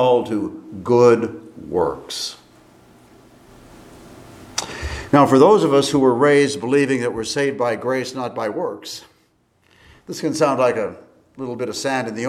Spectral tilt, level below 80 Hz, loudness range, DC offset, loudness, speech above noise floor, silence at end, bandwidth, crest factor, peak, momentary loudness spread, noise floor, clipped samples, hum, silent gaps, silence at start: -5 dB/octave; -48 dBFS; 12 LU; under 0.1%; -18 LUFS; 43 dB; 0 s; 15 kHz; 20 dB; 0 dBFS; 16 LU; -61 dBFS; under 0.1%; none; none; 0 s